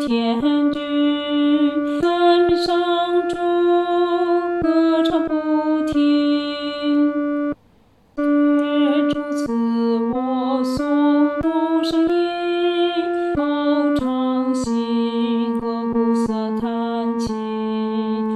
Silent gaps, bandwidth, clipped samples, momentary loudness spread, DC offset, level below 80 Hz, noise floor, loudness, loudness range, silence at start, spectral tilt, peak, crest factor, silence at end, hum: none; 10.5 kHz; under 0.1%; 6 LU; under 0.1%; -50 dBFS; -54 dBFS; -19 LUFS; 3 LU; 0 s; -6 dB/octave; -6 dBFS; 12 dB; 0 s; none